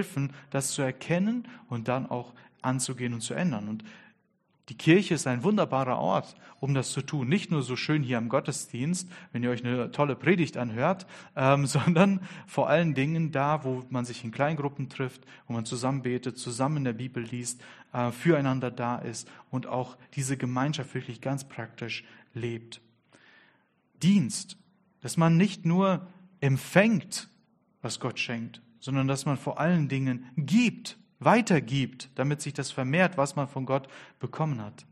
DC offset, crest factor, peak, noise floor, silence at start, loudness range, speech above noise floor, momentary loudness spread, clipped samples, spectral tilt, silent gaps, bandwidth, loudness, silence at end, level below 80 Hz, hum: under 0.1%; 26 dB; -4 dBFS; -71 dBFS; 0 s; 6 LU; 43 dB; 13 LU; under 0.1%; -5.5 dB/octave; none; 13 kHz; -28 LUFS; 0.1 s; -68 dBFS; none